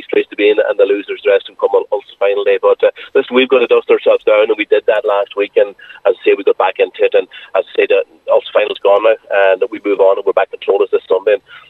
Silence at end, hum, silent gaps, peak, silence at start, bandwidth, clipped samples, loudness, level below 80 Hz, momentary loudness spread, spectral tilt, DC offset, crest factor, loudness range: 0.1 s; none; none; 0 dBFS; 0.1 s; 4.2 kHz; under 0.1%; -13 LUFS; -68 dBFS; 5 LU; -5 dB/octave; under 0.1%; 12 dB; 2 LU